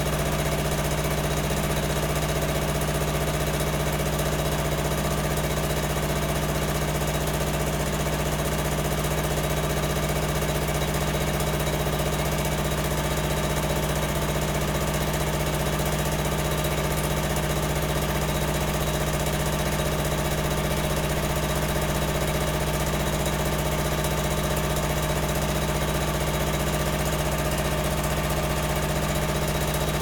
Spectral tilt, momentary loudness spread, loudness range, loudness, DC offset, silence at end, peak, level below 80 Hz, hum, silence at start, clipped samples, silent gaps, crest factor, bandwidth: -4.5 dB/octave; 0 LU; 0 LU; -25 LUFS; under 0.1%; 0 s; -12 dBFS; -32 dBFS; none; 0 s; under 0.1%; none; 14 dB; 19 kHz